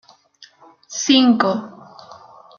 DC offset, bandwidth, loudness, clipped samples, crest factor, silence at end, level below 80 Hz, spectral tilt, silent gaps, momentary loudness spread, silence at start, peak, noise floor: under 0.1%; 7.2 kHz; -16 LUFS; under 0.1%; 20 dB; 0.45 s; -68 dBFS; -3 dB/octave; none; 17 LU; 0.9 s; -2 dBFS; -50 dBFS